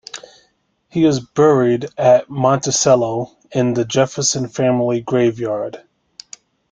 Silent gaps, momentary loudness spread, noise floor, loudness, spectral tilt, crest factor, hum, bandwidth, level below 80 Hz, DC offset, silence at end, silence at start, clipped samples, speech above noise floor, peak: none; 12 LU; -62 dBFS; -16 LUFS; -5 dB/octave; 16 dB; none; 9.8 kHz; -56 dBFS; under 0.1%; 0.95 s; 0.15 s; under 0.1%; 46 dB; -2 dBFS